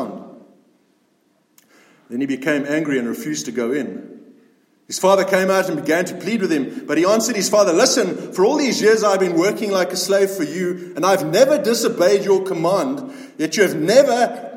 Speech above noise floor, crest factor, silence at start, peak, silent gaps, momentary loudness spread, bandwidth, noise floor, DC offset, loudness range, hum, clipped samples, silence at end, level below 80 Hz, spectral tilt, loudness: 44 dB; 18 dB; 0 s; 0 dBFS; none; 10 LU; 16.5 kHz; -62 dBFS; under 0.1%; 7 LU; none; under 0.1%; 0 s; -72 dBFS; -4 dB/octave; -18 LUFS